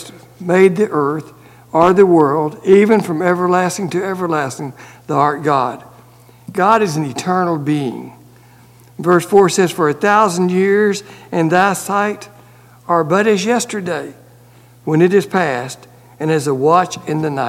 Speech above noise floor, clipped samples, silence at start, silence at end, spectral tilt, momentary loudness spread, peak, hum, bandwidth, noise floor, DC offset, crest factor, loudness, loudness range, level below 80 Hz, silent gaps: 30 dB; under 0.1%; 0 s; 0 s; -5.5 dB/octave; 13 LU; 0 dBFS; none; 16 kHz; -44 dBFS; under 0.1%; 16 dB; -15 LUFS; 5 LU; -58 dBFS; none